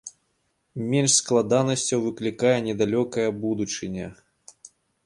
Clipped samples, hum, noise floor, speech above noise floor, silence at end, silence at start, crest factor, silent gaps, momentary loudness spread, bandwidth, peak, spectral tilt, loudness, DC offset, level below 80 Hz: under 0.1%; none; -72 dBFS; 49 dB; 0.4 s; 0.05 s; 18 dB; none; 15 LU; 11.5 kHz; -6 dBFS; -4 dB/octave; -23 LUFS; under 0.1%; -60 dBFS